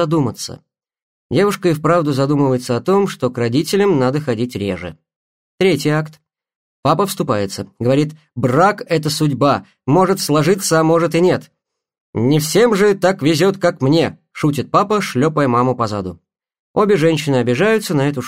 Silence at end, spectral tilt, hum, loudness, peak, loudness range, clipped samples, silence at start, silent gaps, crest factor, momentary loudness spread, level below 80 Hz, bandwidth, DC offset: 0 s; -6 dB/octave; none; -16 LUFS; -2 dBFS; 4 LU; under 0.1%; 0 s; 1.02-1.30 s, 5.16-5.58 s, 6.56-6.83 s, 12.01-12.13 s, 16.59-16.74 s; 14 dB; 8 LU; -56 dBFS; 16 kHz; 0.2%